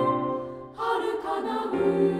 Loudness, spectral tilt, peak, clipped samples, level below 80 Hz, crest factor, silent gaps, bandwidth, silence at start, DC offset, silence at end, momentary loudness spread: -28 LUFS; -7 dB/octave; -12 dBFS; under 0.1%; -60 dBFS; 14 dB; none; 11.5 kHz; 0 s; under 0.1%; 0 s; 8 LU